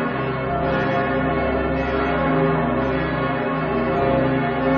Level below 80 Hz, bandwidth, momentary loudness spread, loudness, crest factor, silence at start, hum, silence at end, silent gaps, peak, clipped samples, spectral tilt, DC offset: -36 dBFS; 6.4 kHz; 3 LU; -21 LUFS; 14 dB; 0 s; none; 0 s; none; -8 dBFS; under 0.1%; -9 dB/octave; under 0.1%